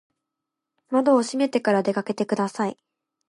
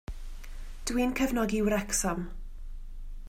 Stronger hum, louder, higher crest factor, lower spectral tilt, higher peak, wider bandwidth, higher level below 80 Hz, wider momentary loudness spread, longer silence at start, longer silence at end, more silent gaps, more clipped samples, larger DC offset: neither; first, -23 LUFS vs -29 LUFS; about the same, 16 dB vs 16 dB; first, -5.5 dB/octave vs -4 dB/octave; first, -8 dBFS vs -14 dBFS; second, 11.5 kHz vs 16 kHz; second, -76 dBFS vs -40 dBFS; second, 7 LU vs 21 LU; first, 0.9 s vs 0.1 s; first, 0.55 s vs 0 s; neither; neither; neither